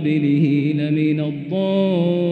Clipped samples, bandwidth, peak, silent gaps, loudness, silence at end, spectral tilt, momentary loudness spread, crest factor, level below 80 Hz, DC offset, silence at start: under 0.1%; 4.8 kHz; -6 dBFS; none; -19 LUFS; 0 s; -10 dB/octave; 6 LU; 12 dB; -66 dBFS; under 0.1%; 0 s